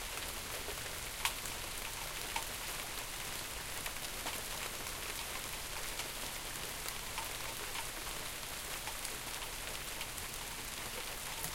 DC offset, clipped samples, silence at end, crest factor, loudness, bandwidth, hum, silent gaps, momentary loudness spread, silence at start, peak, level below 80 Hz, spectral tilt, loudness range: under 0.1%; under 0.1%; 0 s; 28 dB; -40 LUFS; 17 kHz; none; none; 2 LU; 0 s; -14 dBFS; -52 dBFS; -1 dB/octave; 1 LU